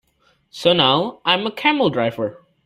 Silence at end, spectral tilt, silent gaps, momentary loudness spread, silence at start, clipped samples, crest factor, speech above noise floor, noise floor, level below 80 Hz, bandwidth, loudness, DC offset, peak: 0.3 s; -5.5 dB/octave; none; 8 LU; 0.55 s; under 0.1%; 18 dB; 43 dB; -61 dBFS; -58 dBFS; 15 kHz; -18 LUFS; under 0.1%; 0 dBFS